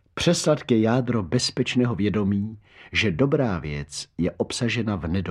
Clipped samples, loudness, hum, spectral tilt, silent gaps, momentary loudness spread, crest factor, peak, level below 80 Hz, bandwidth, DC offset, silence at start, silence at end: under 0.1%; -24 LUFS; none; -5.5 dB/octave; none; 8 LU; 18 dB; -6 dBFS; -46 dBFS; 13 kHz; under 0.1%; 0.15 s; 0 s